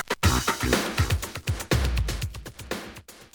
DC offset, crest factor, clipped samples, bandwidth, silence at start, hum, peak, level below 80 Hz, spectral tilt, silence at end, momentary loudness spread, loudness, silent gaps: under 0.1%; 20 dB; under 0.1%; over 20 kHz; 0 s; none; -6 dBFS; -34 dBFS; -4 dB/octave; 0.1 s; 13 LU; -27 LUFS; none